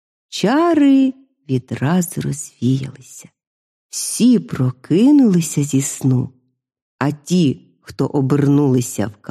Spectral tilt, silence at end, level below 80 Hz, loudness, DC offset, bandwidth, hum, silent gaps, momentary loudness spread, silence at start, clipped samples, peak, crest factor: -6 dB/octave; 0.15 s; -56 dBFS; -17 LUFS; under 0.1%; 14.5 kHz; none; 3.47-3.89 s, 6.82-6.99 s; 12 LU; 0.3 s; under 0.1%; 0 dBFS; 16 dB